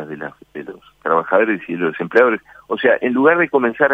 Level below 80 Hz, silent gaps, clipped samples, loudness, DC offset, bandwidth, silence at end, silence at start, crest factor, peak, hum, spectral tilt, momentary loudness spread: -64 dBFS; none; under 0.1%; -16 LUFS; under 0.1%; 5.8 kHz; 0 s; 0 s; 18 dB; 0 dBFS; none; -7.5 dB/octave; 18 LU